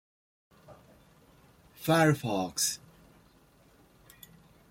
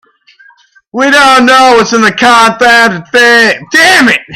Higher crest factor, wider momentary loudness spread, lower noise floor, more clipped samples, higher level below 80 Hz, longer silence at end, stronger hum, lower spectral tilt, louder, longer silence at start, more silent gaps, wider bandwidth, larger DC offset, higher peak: first, 22 dB vs 6 dB; first, 28 LU vs 4 LU; first, -62 dBFS vs -42 dBFS; second, under 0.1% vs 1%; second, -66 dBFS vs -44 dBFS; first, 1.95 s vs 0 s; neither; first, -4 dB/octave vs -2.5 dB/octave; second, -28 LUFS vs -4 LUFS; second, 0.7 s vs 0.95 s; neither; about the same, 16.5 kHz vs 17 kHz; neither; second, -12 dBFS vs 0 dBFS